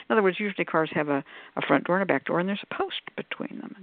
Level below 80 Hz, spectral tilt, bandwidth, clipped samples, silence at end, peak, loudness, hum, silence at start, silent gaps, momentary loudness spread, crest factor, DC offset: -74 dBFS; -4 dB/octave; 4.6 kHz; under 0.1%; 0 s; -4 dBFS; -27 LUFS; none; 0 s; none; 11 LU; 22 dB; under 0.1%